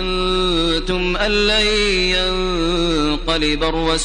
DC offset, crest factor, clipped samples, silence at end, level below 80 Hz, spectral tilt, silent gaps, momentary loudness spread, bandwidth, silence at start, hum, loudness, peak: under 0.1%; 14 dB; under 0.1%; 0 s; -26 dBFS; -3.5 dB/octave; none; 4 LU; 10 kHz; 0 s; none; -17 LUFS; -4 dBFS